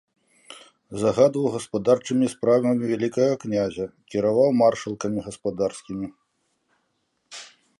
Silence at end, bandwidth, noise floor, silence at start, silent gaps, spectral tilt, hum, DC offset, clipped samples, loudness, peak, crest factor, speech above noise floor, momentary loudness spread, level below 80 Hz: 0.35 s; 11.5 kHz; -73 dBFS; 0.55 s; none; -6 dB/octave; none; under 0.1%; under 0.1%; -23 LUFS; -6 dBFS; 18 dB; 50 dB; 15 LU; -60 dBFS